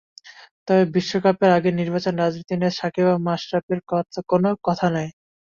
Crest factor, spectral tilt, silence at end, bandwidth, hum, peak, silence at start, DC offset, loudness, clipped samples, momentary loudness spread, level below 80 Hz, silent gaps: 18 dB; -7 dB/octave; 0.3 s; 7.2 kHz; none; -4 dBFS; 0.25 s; under 0.1%; -21 LUFS; under 0.1%; 7 LU; -60 dBFS; 0.51-0.66 s, 3.63-3.69 s